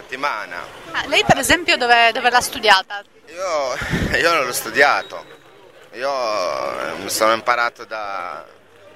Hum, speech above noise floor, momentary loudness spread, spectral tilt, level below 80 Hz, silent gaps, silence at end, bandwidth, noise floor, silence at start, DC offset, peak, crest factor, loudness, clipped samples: none; 27 dB; 17 LU; -2.5 dB/octave; -44 dBFS; none; 0.5 s; 16 kHz; -46 dBFS; 0 s; 0.2%; 0 dBFS; 20 dB; -17 LUFS; under 0.1%